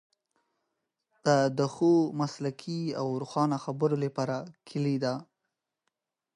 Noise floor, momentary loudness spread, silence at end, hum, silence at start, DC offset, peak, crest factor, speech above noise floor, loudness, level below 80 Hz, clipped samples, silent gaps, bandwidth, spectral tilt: -85 dBFS; 10 LU; 1.15 s; none; 1.25 s; under 0.1%; -12 dBFS; 18 dB; 56 dB; -29 LUFS; -78 dBFS; under 0.1%; none; 11 kHz; -6.5 dB/octave